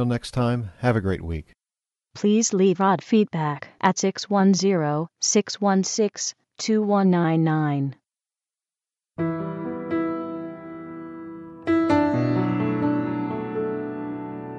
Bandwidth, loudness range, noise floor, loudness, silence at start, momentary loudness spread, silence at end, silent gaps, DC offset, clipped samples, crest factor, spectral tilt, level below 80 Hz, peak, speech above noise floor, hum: 10.5 kHz; 8 LU; under -90 dBFS; -23 LUFS; 0 s; 14 LU; 0 s; none; under 0.1%; under 0.1%; 18 dB; -5.5 dB/octave; -52 dBFS; -4 dBFS; over 68 dB; none